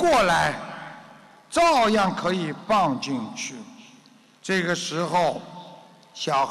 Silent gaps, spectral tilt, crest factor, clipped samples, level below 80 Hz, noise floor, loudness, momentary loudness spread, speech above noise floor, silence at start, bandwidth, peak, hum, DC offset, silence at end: none; -4 dB/octave; 12 dB; under 0.1%; -54 dBFS; -54 dBFS; -23 LUFS; 23 LU; 31 dB; 0 s; 13 kHz; -14 dBFS; none; under 0.1%; 0 s